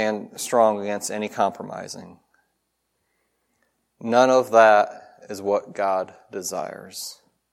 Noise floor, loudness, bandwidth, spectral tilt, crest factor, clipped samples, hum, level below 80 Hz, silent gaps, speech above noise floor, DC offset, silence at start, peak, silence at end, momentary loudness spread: -75 dBFS; -21 LUFS; 16 kHz; -3.5 dB/octave; 20 dB; under 0.1%; none; -76 dBFS; none; 53 dB; under 0.1%; 0 s; -2 dBFS; 0.4 s; 19 LU